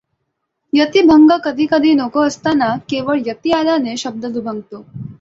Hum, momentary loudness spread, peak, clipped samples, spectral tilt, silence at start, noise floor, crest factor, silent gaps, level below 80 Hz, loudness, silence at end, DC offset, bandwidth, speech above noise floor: none; 16 LU; -2 dBFS; under 0.1%; -5 dB/octave; 0.75 s; -73 dBFS; 14 dB; none; -52 dBFS; -14 LUFS; 0.05 s; under 0.1%; 7.8 kHz; 58 dB